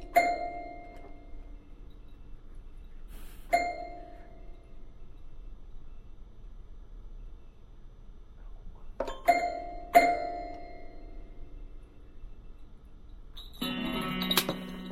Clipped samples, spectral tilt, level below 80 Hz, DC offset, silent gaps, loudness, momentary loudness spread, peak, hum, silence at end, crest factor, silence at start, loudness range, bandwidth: under 0.1%; -3.5 dB/octave; -46 dBFS; under 0.1%; none; -30 LUFS; 27 LU; -6 dBFS; none; 0 s; 28 dB; 0 s; 23 LU; 16 kHz